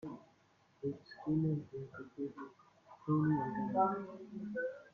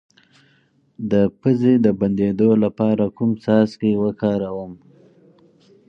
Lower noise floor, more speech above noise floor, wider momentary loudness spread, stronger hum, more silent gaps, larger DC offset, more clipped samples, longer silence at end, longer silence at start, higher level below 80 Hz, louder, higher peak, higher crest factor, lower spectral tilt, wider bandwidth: first, -70 dBFS vs -59 dBFS; second, 34 dB vs 41 dB; first, 16 LU vs 9 LU; neither; neither; neither; neither; second, 0.05 s vs 1.15 s; second, 0.05 s vs 1 s; second, -74 dBFS vs -54 dBFS; second, -38 LUFS vs -19 LUFS; second, -20 dBFS vs -4 dBFS; about the same, 20 dB vs 16 dB; about the same, -10 dB/octave vs -9.5 dB/octave; about the same, 6.4 kHz vs 6.2 kHz